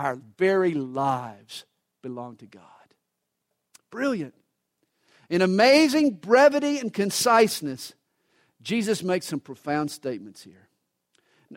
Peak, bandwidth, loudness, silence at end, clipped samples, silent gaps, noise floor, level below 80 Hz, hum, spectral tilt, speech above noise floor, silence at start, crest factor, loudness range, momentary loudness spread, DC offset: -6 dBFS; 16 kHz; -23 LUFS; 0 s; under 0.1%; none; -80 dBFS; -72 dBFS; none; -4.5 dB/octave; 57 dB; 0 s; 20 dB; 15 LU; 22 LU; under 0.1%